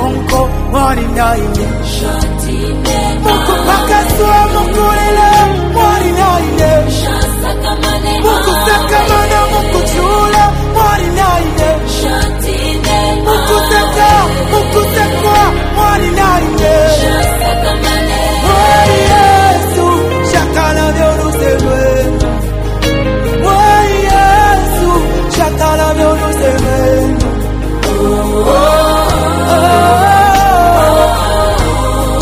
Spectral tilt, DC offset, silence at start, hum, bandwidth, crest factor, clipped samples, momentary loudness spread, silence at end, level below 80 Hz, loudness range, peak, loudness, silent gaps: -5 dB/octave; under 0.1%; 0 s; none; 16 kHz; 10 dB; 0.4%; 6 LU; 0 s; -16 dBFS; 3 LU; 0 dBFS; -10 LUFS; none